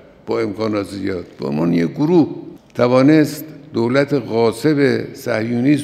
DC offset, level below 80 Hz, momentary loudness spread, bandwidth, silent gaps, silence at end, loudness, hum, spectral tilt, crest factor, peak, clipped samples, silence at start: under 0.1%; -58 dBFS; 12 LU; 15 kHz; none; 0 s; -17 LUFS; none; -7 dB/octave; 16 dB; 0 dBFS; under 0.1%; 0.25 s